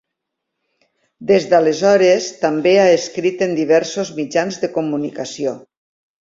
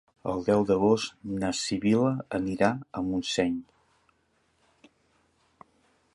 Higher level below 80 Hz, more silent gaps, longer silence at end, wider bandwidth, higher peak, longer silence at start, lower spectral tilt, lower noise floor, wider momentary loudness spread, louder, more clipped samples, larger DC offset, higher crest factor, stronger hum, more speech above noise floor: about the same, -62 dBFS vs -58 dBFS; neither; second, 0.6 s vs 2.5 s; second, 7.8 kHz vs 11.5 kHz; first, -2 dBFS vs -8 dBFS; first, 1.2 s vs 0.25 s; about the same, -4.5 dB/octave vs -5.5 dB/octave; first, -78 dBFS vs -70 dBFS; about the same, 11 LU vs 9 LU; first, -16 LUFS vs -27 LUFS; neither; neither; second, 16 dB vs 22 dB; neither; first, 63 dB vs 44 dB